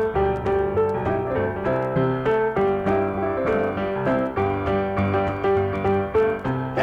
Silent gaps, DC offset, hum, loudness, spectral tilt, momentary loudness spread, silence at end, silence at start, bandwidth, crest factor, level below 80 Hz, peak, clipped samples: none; under 0.1%; none; -23 LUFS; -9 dB/octave; 3 LU; 0 s; 0 s; 6.2 kHz; 12 dB; -42 dBFS; -10 dBFS; under 0.1%